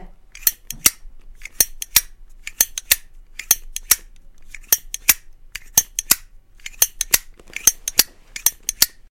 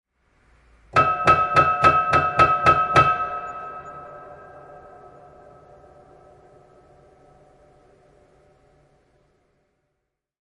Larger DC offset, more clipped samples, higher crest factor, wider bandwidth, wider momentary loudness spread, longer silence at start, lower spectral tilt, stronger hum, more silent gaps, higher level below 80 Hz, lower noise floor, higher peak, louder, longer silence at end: neither; neither; about the same, 22 dB vs 22 dB; first, over 20 kHz vs 11.5 kHz; second, 19 LU vs 23 LU; second, 0 s vs 0.95 s; second, 1.5 dB/octave vs -5.5 dB/octave; neither; neither; first, -42 dBFS vs -50 dBFS; second, -42 dBFS vs -79 dBFS; about the same, 0 dBFS vs -2 dBFS; about the same, -18 LUFS vs -18 LUFS; second, 0.25 s vs 5.75 s